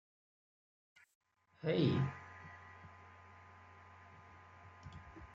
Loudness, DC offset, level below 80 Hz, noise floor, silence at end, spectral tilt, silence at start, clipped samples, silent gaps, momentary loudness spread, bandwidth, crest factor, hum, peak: -37 LUFS; under 0.1%; -72 dBFS; -59 dBFS; 0 s; -8 dB/octave; 1.65 s; under 0.1%; none; 24 LU; 7.4 kHz; 22 dB; none; -22 dBFS